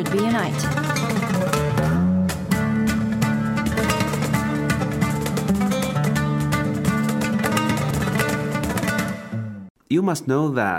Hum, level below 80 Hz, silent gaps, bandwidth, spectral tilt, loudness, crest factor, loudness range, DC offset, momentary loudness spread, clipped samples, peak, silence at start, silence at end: none; -42 dBFS; 9.70-9.75 s; 16.5 kHz; -6 dB/octave; -22 LUFS; 14 dB; 2 LU; under 0.1%; 3 LU; under 0.1%; -6 dBFS; 0 s; 0 s